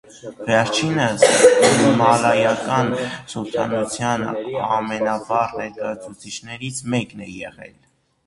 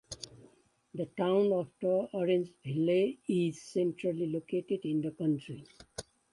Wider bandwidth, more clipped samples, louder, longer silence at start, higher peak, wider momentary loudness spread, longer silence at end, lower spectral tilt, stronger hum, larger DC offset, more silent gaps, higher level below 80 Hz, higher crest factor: about the same, 11.5 kHz vs 11.5 kHz; neither; first, -18 LUFS vs -32 LUFS; about the same, 0.15 s vs 0.1 s; first, 0 dBFS vs -18 dBFS; about the same, 19 LU vs 18 LU; first, 0.6 s vs 0.3 s; second, -4 dB/octave vs -7 dB/octave; neither; neither; neither; first, -56 dBFS vs -70 dBFS; about the same, 20 dB vs 16 dB